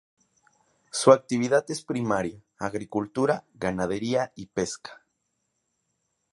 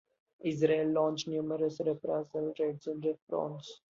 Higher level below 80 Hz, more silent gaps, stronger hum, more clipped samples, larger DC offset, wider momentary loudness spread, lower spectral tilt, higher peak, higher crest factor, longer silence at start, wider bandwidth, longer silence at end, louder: first, -60 dBFS vs -76 dBFS; second, none vs 3.22-3.27 s; neither; neither; neither; first, 14 LU vs 8 LU; second, -5 dB/octave vs -6.5 dB/octave; first, -2 dBFS vs -14 dBFS; first, 26 dB vs 20 dB; first, 0.95 s vs 0.45 s; first, 11.5 kHz vs 7.6 kHz; first, 1.4 s vs 0.25 s; first, -26 LUFS vs -33 LUFS